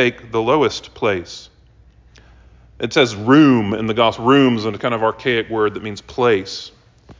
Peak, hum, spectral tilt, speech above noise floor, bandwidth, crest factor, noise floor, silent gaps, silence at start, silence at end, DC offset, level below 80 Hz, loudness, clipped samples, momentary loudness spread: -2 dBFS; none; -5.5 dB/octave; 32 dB; 7.6 kHz; 16 dB; -49 dBFS; none; 0 s; 0.05 s; under 0.1%; -48 dBFS; -17 LUFS; under 0.1%; 16 LU